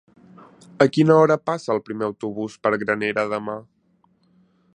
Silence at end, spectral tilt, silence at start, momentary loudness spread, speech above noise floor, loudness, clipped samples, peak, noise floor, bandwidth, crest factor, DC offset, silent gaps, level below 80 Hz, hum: 1.15 s; -7 dB/octave; 0.8 s; 14 LU; 42 dB; -21 LUFS; under 0.1%; 0 dBFS; -62 dBFS; 10 kHz; 22 dB; under 0.1%; none; -66 dBFS; none